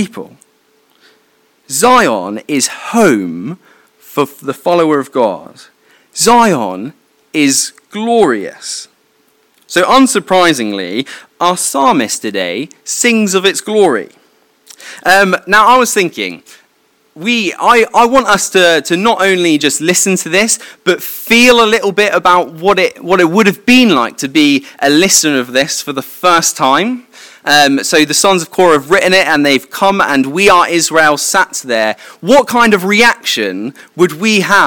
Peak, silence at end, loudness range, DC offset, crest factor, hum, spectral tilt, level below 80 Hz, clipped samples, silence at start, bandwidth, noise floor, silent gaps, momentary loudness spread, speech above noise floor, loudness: 0 dBFS; 0 s; 4 LU; under 0.1%; 12 dB; none; -3 dB/octave; -50 dBFS; 0.9%; 0 s; 18.5 kHz; -54 dBFS; none; 11 LU; 44 dB; -10 LUFS